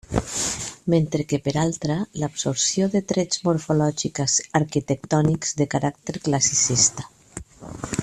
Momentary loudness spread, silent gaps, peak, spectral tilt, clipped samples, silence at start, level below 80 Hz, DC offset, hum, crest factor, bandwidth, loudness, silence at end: 11 LU; none; -4 dBFS; -4 dB/octave; under 0.1%; 0.1 s; -48 dBFS; under 0.1%; none; 20 dB; 13 kHz; -22 LUFS; 0 s